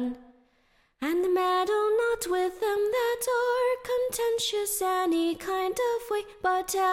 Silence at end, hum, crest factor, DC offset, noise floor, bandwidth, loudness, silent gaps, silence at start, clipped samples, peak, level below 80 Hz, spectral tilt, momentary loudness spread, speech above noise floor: 0 s; none; 12 dB; under 0.1%; -67 dBFS; 16.5 kHz; -27 LUFS; none; 0 s; under 0.1%; -16 dBFS; -60 dBFS; -2 dB/octave; 5 LU; 40 dB